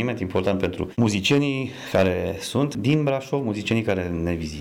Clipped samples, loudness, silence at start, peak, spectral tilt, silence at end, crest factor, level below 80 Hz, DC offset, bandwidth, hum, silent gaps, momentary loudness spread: under 0.1%; -23 LUFS; 0 s; -10 dBFS; -6 dB/octave; 0 s; 12 dB; -46 dBFS; under 0.1%; 17 kHz; none; none; 6 LU